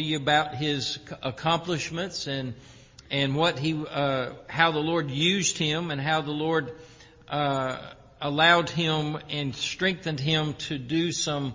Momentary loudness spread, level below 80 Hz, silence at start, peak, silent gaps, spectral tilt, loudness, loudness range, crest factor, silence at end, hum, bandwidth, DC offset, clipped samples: 10 LU; -58 dBFS; 0 s; -6 dBFS; none; -4 dB/octave; -26 LUFS; 3 LU; 22 dB; 0 s; none; 7.6 kHz; under 0.1%; under 0.1%